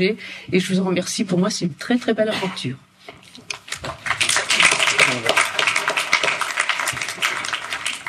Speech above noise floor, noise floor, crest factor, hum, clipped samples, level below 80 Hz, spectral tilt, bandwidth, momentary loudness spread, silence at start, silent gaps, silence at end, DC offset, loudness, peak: 22 dB; -43 dBFS; 18 dB; none; under 0.1%; -58 dBFS; -2.5 dB/octave; 15.5 kHz; 14 LU; 0 s; none; 0 s; under 0.1%; -19 LUFS; -2 dBFS